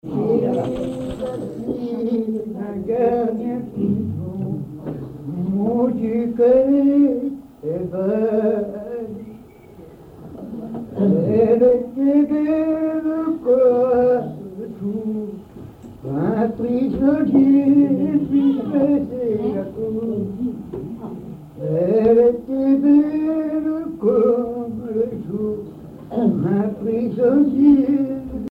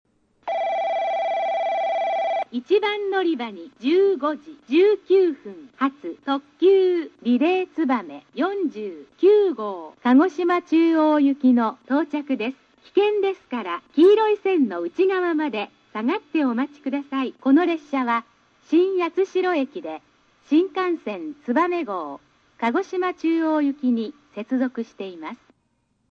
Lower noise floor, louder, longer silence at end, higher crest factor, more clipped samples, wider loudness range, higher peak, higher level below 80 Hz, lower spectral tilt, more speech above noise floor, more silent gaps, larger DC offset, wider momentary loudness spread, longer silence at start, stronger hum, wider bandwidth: second, -42 dBFS vs -69 dBFS; first, -19 LUFS vs -22 LUFS; second, 0 s vs 0.75 s; about the same, 14 dB vs 14 dB; neither; about the same, 6 LU vs 4 LU; first, -4 dBFS vs -8 dBFS; first, -50 dBFS vs -74 dBFS; first, -10 dB/octave vs -6 dB/octave; second, 20 dB vs 48 dB; neither; neither; about the same, 16 LU vs 14 LU; second, 0.05 s vs 0.45 s; neither; second, 4.5 kHz vs 6.8 kHz